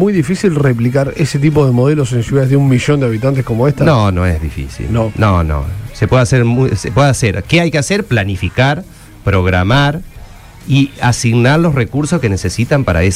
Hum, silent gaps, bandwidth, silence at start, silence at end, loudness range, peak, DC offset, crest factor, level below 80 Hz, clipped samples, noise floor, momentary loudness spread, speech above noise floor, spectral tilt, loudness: none; none; 14.5 kHz; 0 s; 0 s; 2 LU; 0 dBFS; under 0.1%; 12 dB; -28 dBFS; under 0.1%; -33 dBFS; 6 LU; 21 dB; -6.5 dB/octave; -13 LUFS